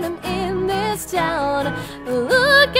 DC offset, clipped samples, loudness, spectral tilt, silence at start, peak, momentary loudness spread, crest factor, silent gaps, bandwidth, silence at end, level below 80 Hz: under 0.1%; under 0.1%; -19 LUFS; -4 dB/octave; 0 s; 0 dBFS; 11 LU; 18 dB; none; 16 kHz; 0 s; -42 dBFS